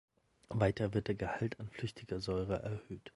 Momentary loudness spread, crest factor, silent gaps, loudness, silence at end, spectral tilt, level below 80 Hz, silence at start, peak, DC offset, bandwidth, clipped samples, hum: 10 LU; 20 dB; none; -38 LUFS; 0.05 s; -7 dB/octave; -56 dBFS; 0.5 s; -18 dBFS; under 0.1%; 11.5 kHz; under 0.1%; none